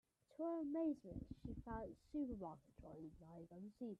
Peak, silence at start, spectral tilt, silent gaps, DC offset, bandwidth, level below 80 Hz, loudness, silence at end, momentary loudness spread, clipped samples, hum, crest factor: -34 dBFS; 0.3 s; -9.5 dB/octave; none; under 0.1%; 8.6 kHz; -66 dBFS; -49 LUFS; 0 s; 16 LU; under 0.1%; none; 16 dB